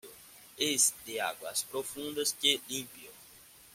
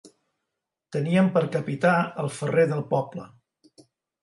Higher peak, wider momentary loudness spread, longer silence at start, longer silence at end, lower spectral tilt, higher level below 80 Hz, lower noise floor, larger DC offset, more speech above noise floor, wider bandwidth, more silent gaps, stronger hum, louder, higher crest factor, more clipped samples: second, -12 dBFS vs -8 dBFS; first, 24 LU vs 10 LU; about the same, 0.05 s vs 0.05 s; second, 0.05 s vs 0.95 s; second, -0.5 dB/octave vs -7 dB/octave; about the same, -74 dBFS vs -70 dBFS; second, -56 dBFS vs -84 dBFS; neither; second, 23 dB vs 60 dB; first, 16.5 kHz vs 11.5 kHz; neither; neither; second, -31 LUFS vs -24 LUFS; first, 24 dB vs 18 dB; neither